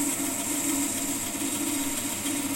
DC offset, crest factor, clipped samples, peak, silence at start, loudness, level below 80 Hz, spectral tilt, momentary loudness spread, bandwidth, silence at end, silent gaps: under 0.1%; 14 dB; under 0.1%; -16 dBFS; 0 s; -27 LUFS; -56 dBFS; -2 dB/octave; 2 LU; 16.5 kHz; 0 s; none